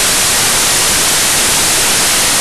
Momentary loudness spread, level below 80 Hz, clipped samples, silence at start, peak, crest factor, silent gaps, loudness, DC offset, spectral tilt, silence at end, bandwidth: 0 LU; -34 dBFS; under 0.1%; 0 s; -6 dBFS; 6 dB; none; -8 LUFS; 3%; 0 dB/octave; 0 s; 12 kHz